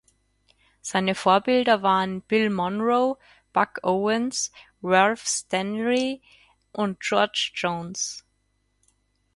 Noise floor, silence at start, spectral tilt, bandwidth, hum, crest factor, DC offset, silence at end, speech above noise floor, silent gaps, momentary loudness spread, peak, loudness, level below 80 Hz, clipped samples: -70 dBFS; 0.85 s; -3.5 dB/octave; 11.5 kHz; 50 Hz at -65 dBFS; 20 dB; under 0.1%; 1.15 s; 47 dB; none; 10 LU; -4 dBFS; -24 LUFS; -64 dBFS; under 0.1%